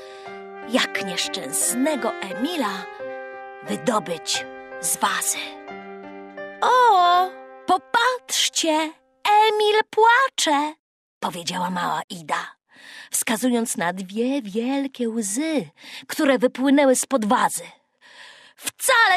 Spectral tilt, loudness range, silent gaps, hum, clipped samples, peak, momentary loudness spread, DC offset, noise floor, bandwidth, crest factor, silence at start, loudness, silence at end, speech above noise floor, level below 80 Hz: -2 dB/octave; 6 LU; 10.79-11.21 s, 12.04-12.08 s; none; under 0.1%; -6 dBFS; 20 LU; under 0.1%; -48 dBFS; 15.5 kHz; 18 dB; 0 s; -21 LUFS; 0 s; 27 dB; -70 dBFS